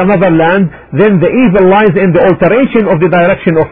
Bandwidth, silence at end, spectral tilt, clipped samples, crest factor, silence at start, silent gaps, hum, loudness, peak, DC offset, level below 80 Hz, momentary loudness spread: 4.7 kHz; 0 s; -11.5 dB/octave; 0.2%; 8 dB; 0 s; none; none; -8 LUFS; 0 dBFS; under 0.1%; -36 dBFS; 4 LU